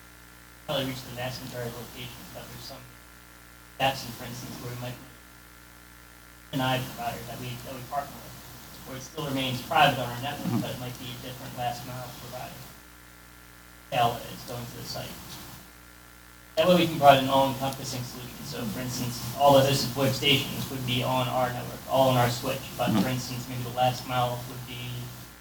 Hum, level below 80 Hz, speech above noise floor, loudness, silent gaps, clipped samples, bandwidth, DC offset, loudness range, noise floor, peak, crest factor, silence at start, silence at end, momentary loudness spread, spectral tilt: 60 Hz at -55 dBFS; -54 dBFS; 22 dB; -28 LUFS; none; under 0.1%; over 20 kHz; under 0.1%; 11 LU; -50 dBFS; -2 dBFS; 26 dB; 0 s; 0 s; 27 LU; -4.5 dB/octave